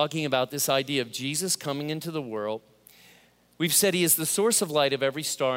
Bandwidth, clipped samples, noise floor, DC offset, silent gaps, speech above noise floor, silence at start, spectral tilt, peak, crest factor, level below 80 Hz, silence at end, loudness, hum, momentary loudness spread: 16 kHz; under 0.1%; -58 dBFS; under 0.1%; none; 32 dB; 0 s; -3 dB/octave; -8 dBFS; 18 dB; -74 dBFS; 0 s; -25 LUFS; none; 11 LU